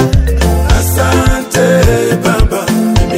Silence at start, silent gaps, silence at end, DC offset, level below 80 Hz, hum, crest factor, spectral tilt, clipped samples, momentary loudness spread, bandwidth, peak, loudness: 0 s; none; 0 s; under 0.1%; -14 dBFS; none; 10 dB; -5.5 dB/octave; 0.5%; 3 LU; 16.5 kHz; 0 dBFS; -11 LUFS